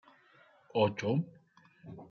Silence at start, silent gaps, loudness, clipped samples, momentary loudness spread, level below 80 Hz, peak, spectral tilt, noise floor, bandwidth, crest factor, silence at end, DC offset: 0.75 s; none; -33 LUFS; under 0.1%; 21 LU; -78 dBFS; -16 dBFS; -5.5 dB/octave; -64 dBFS; 7 kHz; 20 dB; 0.05 s; under 0.1%